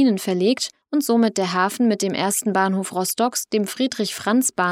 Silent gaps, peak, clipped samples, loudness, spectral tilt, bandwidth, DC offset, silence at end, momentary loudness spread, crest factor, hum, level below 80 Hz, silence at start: none; -6 dBFS; under 0.1%; -21 LUFS; -4 dB/octave; 17 kHz; under 0.1%; 0 s; 5 LU; 16 dB; none; -72 dBFS; 0 s